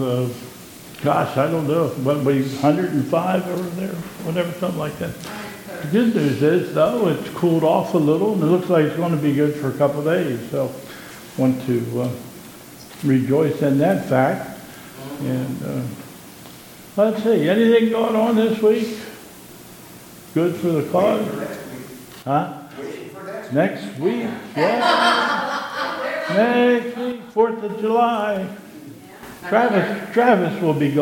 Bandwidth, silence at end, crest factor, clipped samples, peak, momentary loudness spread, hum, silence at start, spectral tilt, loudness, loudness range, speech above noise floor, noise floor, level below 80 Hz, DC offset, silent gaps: 17.5 kHz; 0 s; 20 dB; under 0.1%; 0 dBFS; 20 LU; none; 0 s; -6.5 dB/octave; -20 LUFS; 5 LU; 22 dB; -41 dBFS; -60 dBFS; under 0.1%; none